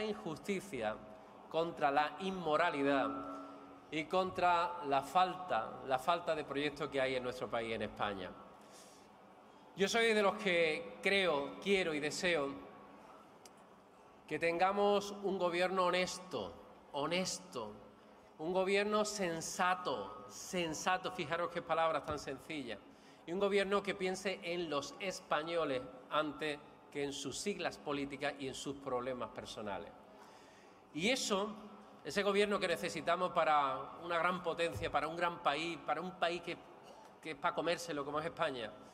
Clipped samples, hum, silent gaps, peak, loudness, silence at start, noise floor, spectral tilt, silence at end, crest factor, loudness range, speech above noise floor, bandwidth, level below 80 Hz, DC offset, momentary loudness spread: under 0.1%; none; none; -18 dBFS; -37 LUFS; 0 s; -61 dBFS; -3.5 dB/octave; 0 s; 20 dB; 5 LU; 24 dB; 15.5 kHz; -70 dBFS; under 0.1%; 15 LU